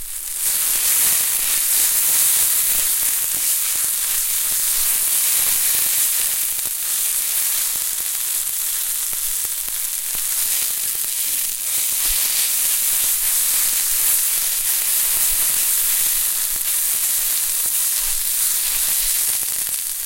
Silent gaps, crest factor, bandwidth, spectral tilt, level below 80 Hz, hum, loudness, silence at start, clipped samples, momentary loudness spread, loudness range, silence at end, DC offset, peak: none; 18 dB; 17 kHz; 3 dB/octave; -46 dBFS; none; -16 LUFS; 0 s; under 0.1%; 5 LU; 4 LU; 0 s; under 0.1%; -2 dBFS